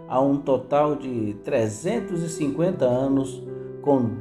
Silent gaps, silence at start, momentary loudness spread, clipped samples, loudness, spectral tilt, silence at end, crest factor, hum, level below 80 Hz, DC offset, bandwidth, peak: none; 0 s; 7 LU; under 0.1%; -24 LUFS; -7 dB/octave; 0 s; 16 dB; none; -56 dBFS; under 0.1%; 12 kHz; -6 dBFS